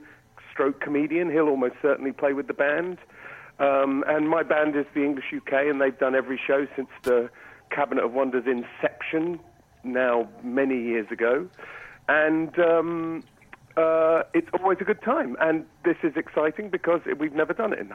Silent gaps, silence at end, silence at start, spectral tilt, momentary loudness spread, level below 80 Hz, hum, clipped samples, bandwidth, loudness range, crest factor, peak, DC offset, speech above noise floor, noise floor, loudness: none; 0 s; 0 s; -7 dB/octave; 10 LU; -66 dBFS; none; under 0.1%; 11.5 kHz; 3 LU; 16 dB; -10 dBFS; under 0.1%; 26 dB; -50 dBFS; -25 LUFS